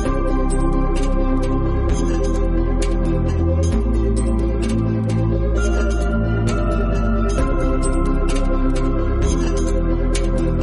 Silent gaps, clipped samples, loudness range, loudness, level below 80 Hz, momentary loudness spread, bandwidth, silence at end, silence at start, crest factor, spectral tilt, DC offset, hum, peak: none; under 0.1%; 1 LU; -20 LUFS; -20 dBFS; 2 LU; 11.5 kHz; 0 s; 0 s; 10 dB; -7 dB/octave; under 0.1%; none; -6 dBFS